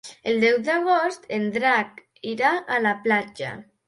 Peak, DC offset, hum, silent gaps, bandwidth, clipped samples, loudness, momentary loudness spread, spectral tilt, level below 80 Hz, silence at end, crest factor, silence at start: -8 dBFS; under 0.1%; none; none; 11.5 kHz; under 0.1%; -22 LUFS; 13 LU; -5 dB/octave; -68 dBFS; 0.25 s; 16 dB; 0.05 s